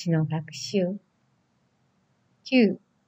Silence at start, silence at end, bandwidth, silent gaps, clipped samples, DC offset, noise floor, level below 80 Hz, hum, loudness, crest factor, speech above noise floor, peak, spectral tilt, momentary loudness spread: 0 s; 0.3 s; 8.4 kHz; none; under 0.1%; under 0.1%; -69 dBFS; -76 dBFS; none; -25 LUFS; 20 dB; 44 dB; -8 dBFS; -6.5 dB/octave; 14 LU